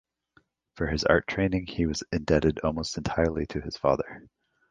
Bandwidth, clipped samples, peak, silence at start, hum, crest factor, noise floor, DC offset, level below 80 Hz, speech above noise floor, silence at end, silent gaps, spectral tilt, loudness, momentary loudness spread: 9.6 kHz; under 0.1%; -4 dBFS; 0.75 s; none; 24 dB; -66 dBFS; under 0.1%; -42 dBFS; 39 dB; 0.5 s; none; -5.5 dB/octave; -27 LUFS; 9 LU